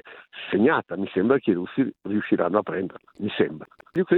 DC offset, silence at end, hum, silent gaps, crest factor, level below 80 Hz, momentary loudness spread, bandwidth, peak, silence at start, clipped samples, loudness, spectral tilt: under 0.1%; 0 s; none; none; 20 dB; -66 dBFS; 12 LU; 4.3 kHz; -4 dBFS; 0.05 s; under 0.1%; -25 LUFS; -9.5 dB/octave